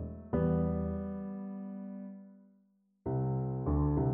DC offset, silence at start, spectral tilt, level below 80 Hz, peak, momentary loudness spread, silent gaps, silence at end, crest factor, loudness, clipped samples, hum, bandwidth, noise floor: under 0.1%; 0 s; -12 dB/octave; -44 dBFS; -20 dBFS; 14 LU; none; 0 s; 16 dB; -35 LUFS; under 0.1%; none; 3.2 kHz; -71 dBFS